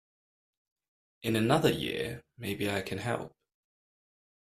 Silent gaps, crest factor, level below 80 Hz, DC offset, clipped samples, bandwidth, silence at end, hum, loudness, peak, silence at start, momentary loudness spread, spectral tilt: none; 24 dB; -62 dBFS; under 0.1%; under 0.1%; 15.5 kHz; 1.25 s; none; -31 LUFS; -10 dBFS; 1.25 s; 12 LU; -5.5 dB/octave